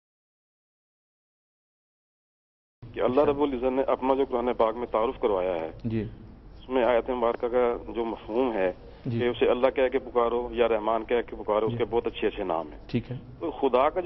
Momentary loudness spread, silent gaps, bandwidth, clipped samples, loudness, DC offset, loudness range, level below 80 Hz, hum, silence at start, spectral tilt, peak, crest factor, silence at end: 9 LU; none; 5.8 kHz; under 0.1%; -27 LUFS; under 0.1%; 3 LU; -50 dBFS; none; 2.8 s; -9 dB/octave; -8 dBFS; 18 dB; 0 s